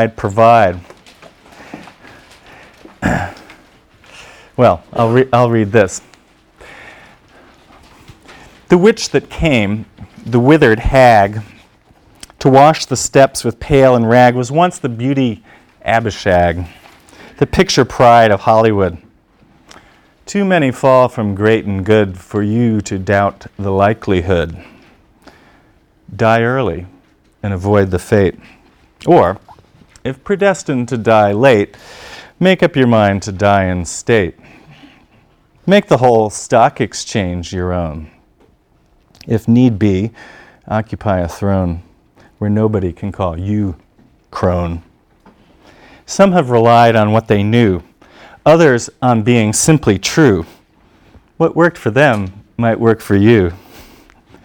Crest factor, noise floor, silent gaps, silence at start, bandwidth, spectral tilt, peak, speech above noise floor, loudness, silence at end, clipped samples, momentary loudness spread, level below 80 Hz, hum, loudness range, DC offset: 14 dB; -53 dBFS; none; 0 s; 18 kHz; -6 dB/octave; 0 dBFS; 41 dB; -13 LUFS; 0.9 s; 0.4%; 14 LU; -38 dBFS; none; 7 LU; under 0.1%